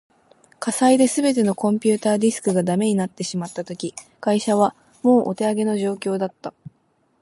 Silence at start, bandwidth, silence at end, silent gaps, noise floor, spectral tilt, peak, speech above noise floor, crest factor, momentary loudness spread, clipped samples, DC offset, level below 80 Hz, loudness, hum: 0.6 s; 11.5 kHz; 0.7 s; none; -64 dBFS; -5.5 dB/octave; -4 dBFS; 44 dB; 16 dB; 12 LU; under 0.1%; under 0.1%; -68 dBFS; -21 LUFS; none